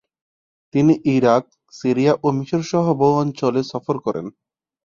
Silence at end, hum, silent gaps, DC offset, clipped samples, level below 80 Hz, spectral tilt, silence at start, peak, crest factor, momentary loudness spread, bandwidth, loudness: 0.55 s; none; none; under 0.1%; under 0.1%; -58 dBFS; -7.5 dB/octave; 0.75 s; -2 dBFS; 18 dB; 9 LU; 7.4 kHz; -19 LUFS